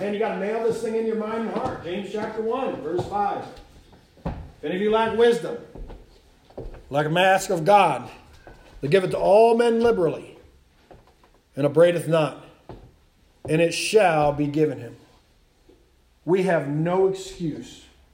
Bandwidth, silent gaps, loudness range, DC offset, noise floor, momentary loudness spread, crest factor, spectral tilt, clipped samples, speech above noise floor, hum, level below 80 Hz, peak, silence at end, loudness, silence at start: 16 kHz; none; 6 LU; under 0.1%; -59 dBFS; 19 LU; 20 dB; -5.5 dB/octave; under 0.1%; 37 dB; none; -50 dBFS; -4 dBFS; 0.35 s; -22 LUFS; 0 s